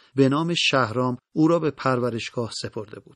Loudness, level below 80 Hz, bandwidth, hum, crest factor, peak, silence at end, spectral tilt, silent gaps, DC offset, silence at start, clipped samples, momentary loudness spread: -23 LUFS; -62 dBFS; 10.5 kHz; none; 18 dB; -6 dBFS; 0.15 s; -5.5 dB/octave; none; under 0.1%; 0.15 s; under 0.1%; 10 LU